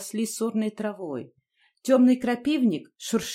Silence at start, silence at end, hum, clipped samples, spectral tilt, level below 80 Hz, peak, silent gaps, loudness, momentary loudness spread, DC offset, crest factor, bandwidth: 0 s; 0 s; none; under 0.1%; -4.5 dB/octave; -66 dBFS; -8 dBFS; none; -25 LUFS; 15 LU; under 0.1%; 16 dB; 16 kHz